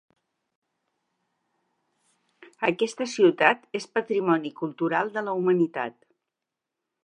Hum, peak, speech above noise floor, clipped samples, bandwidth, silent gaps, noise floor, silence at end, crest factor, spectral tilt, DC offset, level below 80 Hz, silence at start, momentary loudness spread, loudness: none; -2 dBFS; 62 dB; under 0.1%; 10 kHz; none; -86 dBFS; 1.15 s; 26 dB; -5.5 dB/octave; under 0.1%; -82 dBFS; 2.6 s; 8 LU; -25 LUFS